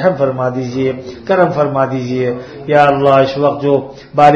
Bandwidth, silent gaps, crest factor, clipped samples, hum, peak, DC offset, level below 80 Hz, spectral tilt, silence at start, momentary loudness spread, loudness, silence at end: 7.8 kHz; none; 12 dB; 0.2%; none; 0 dBFS; under 0.1%; -48 dBFS; -7.5 dB/octave; 0 s; 9 LU; -14 LUFS; 0 s